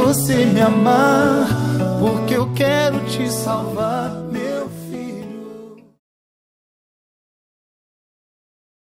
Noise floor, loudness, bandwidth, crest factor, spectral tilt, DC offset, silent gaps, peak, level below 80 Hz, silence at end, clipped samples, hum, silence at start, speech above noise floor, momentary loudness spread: -38 dBFS; -17 LUFS; 16 kHz; 16 dB; -5.5 dB/octave; under 0.1%; none; -2 dBFS; -48 dBFS; 3.05 s; under 0.1%; none; 0 s; 22 dB; 16 LU